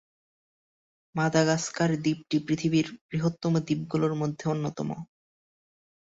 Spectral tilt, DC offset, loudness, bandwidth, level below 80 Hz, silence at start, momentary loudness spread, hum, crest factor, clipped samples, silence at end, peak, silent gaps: -6 dB/octave; under 0.1%; -28 LUFS; 8 kHz; -64 dBFS; 1.15 s; 8 LU; none; 22 dB; under 0.1%; 1 s; -8 dBFS; 3.01-3.09 s